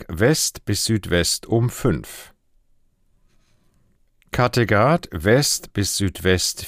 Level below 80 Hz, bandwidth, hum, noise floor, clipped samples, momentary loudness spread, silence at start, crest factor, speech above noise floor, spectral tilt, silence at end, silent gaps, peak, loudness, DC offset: -44 dBFS; 16 kHz; none; -60 dBFS; under 0.1%; 6 LU; 0 s; 18 dB; 40 dB; -4 dB/octave; 0 s; none; -4 dBFS; -20 LUFS; under 0.1%